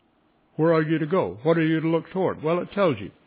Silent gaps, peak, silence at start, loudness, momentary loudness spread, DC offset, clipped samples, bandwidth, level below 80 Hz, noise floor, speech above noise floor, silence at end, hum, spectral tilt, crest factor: none; -8 dBFS; 0.6 s; -23 LUFS; 4 LU; under 0.1%; under 0.1%; 4 kHz; -60 dBFS; -64 dBFS; 41 dB; 0.15 s; none; -11.5 dB/octave; 16 dB